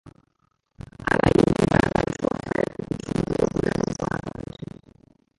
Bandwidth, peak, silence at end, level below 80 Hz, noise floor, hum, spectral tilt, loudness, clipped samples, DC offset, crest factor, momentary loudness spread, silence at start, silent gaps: 11.5 kHz; -2 dBFS; 0.75 s; -42 dBFS; -70 dBFS; none; -6.5 dB/octave; -24 LUFS; under 0.1%; under 0.1%; 22 dB; 18 LU; 0.05 s; none